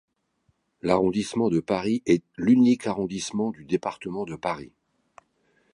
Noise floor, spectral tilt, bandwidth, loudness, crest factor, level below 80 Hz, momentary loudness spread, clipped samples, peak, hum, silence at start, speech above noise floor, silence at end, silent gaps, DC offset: -70 dBFS; -6 dB/octave; 11 kHz; -25 LUFS; 20 dB; -58 dBFS; 13 LU; under 0.1%; -6 dBFS; none; 0.85 s; 46 dB; 1.1 s; none; under 0.1%